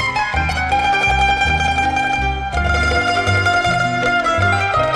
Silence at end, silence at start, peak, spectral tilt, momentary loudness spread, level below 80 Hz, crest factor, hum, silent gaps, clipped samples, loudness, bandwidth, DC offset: 0 s; 0 s; -4 dBFS; -4.5 dB/octave; 4 LU; -28 dBFS; 12 dB; none; none; under 0.1%; -16 LUFS; 12 kHz; under 0.1%